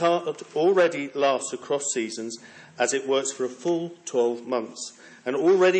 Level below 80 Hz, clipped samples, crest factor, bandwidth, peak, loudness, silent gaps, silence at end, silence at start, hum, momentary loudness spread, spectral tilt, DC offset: -84 dBFS; under 0.1%; 14 dB; 8.8 kHz; -10 dBFS; -25 LUFS; none; 0 s; 0 s; none; 14 LU; -3.5 dB/octave; under 0.1%